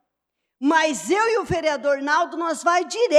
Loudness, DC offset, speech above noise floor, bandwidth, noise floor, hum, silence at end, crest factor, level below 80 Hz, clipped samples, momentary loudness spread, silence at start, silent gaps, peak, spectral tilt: -21 LUFS; under 0.1%; 60 dB; 14 kHz; -80 dBFS; none; 0 s; 18 dB; -54 dBFS; under 0.1%; 4 LU; 0.6 s; none; -4 dBFS; -3.5 dB/octave